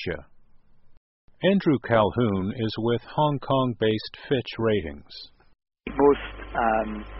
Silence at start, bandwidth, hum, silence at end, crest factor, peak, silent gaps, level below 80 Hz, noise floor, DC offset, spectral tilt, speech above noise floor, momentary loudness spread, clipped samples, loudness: 0 s; 5.8 kHz; none; 0 s; 20 dB; -6 dBFS; 0.97-1.28 s; -48 dBFS; -51 dBFS; under 0.1%; -5 dB/octave; 27 dB; 15 LU; under 0.1%; -25 LUFS